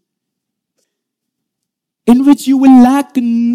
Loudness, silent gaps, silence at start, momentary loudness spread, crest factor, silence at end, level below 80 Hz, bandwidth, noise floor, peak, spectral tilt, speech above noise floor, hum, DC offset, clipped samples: -9 LUFS; none; 2.05 s; 9 LU; 12 dB; 0 s; -50 dBFS; 14.5 kHz; -77 dBFS; 0 dBFS; -5.5 dB/octave; 69 dB; none; under 0.1%; under 0.1%